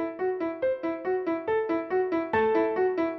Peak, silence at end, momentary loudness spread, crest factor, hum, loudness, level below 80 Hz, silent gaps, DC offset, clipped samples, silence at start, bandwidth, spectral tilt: -14 dBFS; 0 s; 5 LU; 12 dB; none; -27 LUFS; -64 dBFS; none; under 0.1%; under 0.1%; 0 s; 5.8 kHz; -8 dB/octave